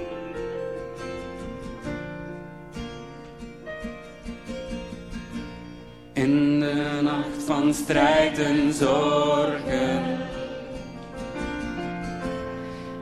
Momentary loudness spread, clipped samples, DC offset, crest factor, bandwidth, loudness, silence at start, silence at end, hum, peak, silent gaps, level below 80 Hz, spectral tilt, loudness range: 18 LU; under 0.1%; 0.2%; 20 dB; 13.5 kHz; -26 LUFS; 0 s; 0 s; none; -6 dBFS; none; -46 dBFS; -5.5 dB/octave; 15 LU